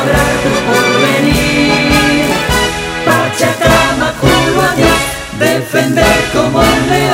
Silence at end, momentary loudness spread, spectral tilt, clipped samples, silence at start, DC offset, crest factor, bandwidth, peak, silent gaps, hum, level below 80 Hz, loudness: 0 s; 4 LU; -4 dB/octave; under 0.1%; 0 s; under 0.1%; 10 dB; 16.5 kHz; 0 dBFS; none; none; -26 dBFS; -10 LUFS